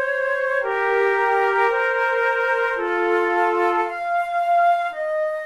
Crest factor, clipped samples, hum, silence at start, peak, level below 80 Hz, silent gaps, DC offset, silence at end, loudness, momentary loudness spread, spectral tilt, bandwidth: 12 dB; under 0.1%; none; 0 s; -8 dBFS; -60 dBFS; none; 0.1%; 0 s; -20 LUFS; 5 LU; -3.5 dB/octave; 13 kHz